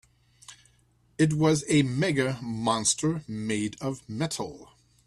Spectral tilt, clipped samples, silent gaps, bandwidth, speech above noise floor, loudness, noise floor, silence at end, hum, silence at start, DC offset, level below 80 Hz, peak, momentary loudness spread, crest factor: -4.5 dB/octave; under 0.1%; none; 12.5 kHz; 38 dB; -27 LUFS; -64 dBFS; 0.45 s; none; 0.5 s; under 0.1%; -60 dBFS; -10 dBFS; 11 LU; 18 dB